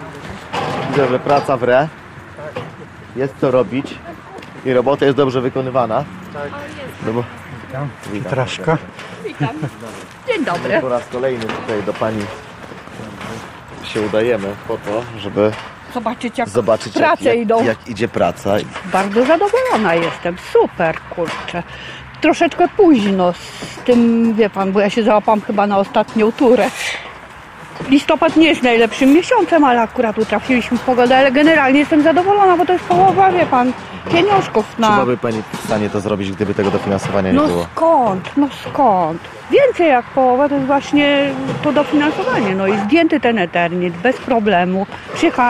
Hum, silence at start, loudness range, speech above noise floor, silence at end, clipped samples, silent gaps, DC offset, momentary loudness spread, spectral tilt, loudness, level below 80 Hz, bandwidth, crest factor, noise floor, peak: none; 0 s; 9 LU; 20 dB; 0 s; under 0.1%; none; under 0.1%; 17 LU; -6 dB/octave; -15 LUFS; -48 dBFS; 14.5 kHz; 14 dB; -35 dBFS; -2 dBFS